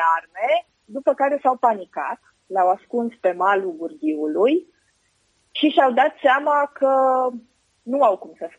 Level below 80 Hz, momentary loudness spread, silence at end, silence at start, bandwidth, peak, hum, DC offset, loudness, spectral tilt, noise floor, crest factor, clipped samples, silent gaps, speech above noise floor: -76 dBFS; 12 LU; 0.1 s; 0 s; 9.4 kHz; -2 dBFS; none; under 0.1%; -20 LUFS; -5 dB/octave; -65 dBFS; 18 dB; under 0.1%; none; 45 dB